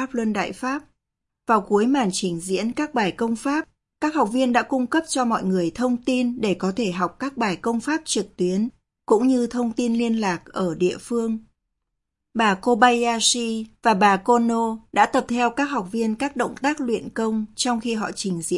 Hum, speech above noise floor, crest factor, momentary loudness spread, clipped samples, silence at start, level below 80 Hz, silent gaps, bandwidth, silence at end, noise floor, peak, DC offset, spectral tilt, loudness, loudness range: none; 60 dB; 20 dB; 8 LU; under 0.1%; 0 s; -58 dBFS; none; 11.5 kHz; 0 s; -81 dBFS; -2 dBFS; under 0.1%; -4 dB/octave; -22 LUFS; 4 LU